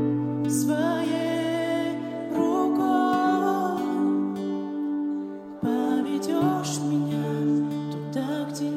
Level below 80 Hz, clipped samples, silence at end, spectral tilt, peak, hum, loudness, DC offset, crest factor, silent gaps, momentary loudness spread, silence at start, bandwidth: -70 dBFS; under 0.1%; 0 s; -6 dB/octave; -10 dBFS; none; -26 LUFS; under 0.1%; 14 dB; none; 7 LU; 0 s; 15 kHz